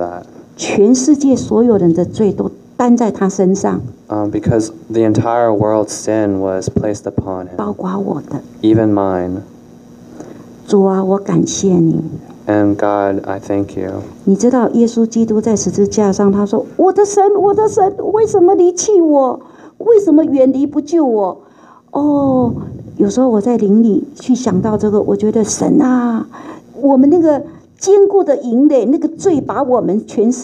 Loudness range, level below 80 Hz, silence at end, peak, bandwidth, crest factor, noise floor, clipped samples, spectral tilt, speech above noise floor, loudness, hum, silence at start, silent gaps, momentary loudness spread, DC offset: 5 LU; -46 dBFS; 0 s; 0 dBFS; 11 kHz; 12 dB; -38 dBFS; under 0.1%; -6.5 dB/octave; 26 dB; -13 LUFS; none; 0 s; none; 11 LU; under 0.1%